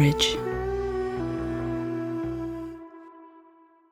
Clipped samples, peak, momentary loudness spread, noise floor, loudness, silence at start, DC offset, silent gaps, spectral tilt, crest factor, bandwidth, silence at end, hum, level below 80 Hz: under 0.1%; -8 dBFS; 20 LU; -56 dBFS; -29 LUFS; 0 s; under 0.1%; none; -5 dB/octave; 20 dB; 15.5 kHz; 0.5 s; none; -44 dBFS